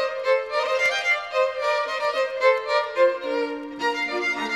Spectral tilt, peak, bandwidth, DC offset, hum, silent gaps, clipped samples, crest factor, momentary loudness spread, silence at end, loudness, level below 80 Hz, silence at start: -1.5 dB/octave; -6 dBFS; 13 kHz; under 0.1%; none; none; under 0.1%; 16 dB; 6 LU; 0 s; -23 LUFS; -66 dBFS; 0 s